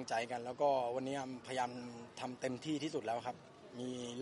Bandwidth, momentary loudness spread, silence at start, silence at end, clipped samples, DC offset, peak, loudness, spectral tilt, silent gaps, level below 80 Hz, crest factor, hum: 11.5 kHz; 13 LU; 0 s; 0 s; under 0.1%; under 0.1%; -22 dBFS; -40 LUFS; -4.5 dB/octave; none; -80 dBFS; 18 dB; none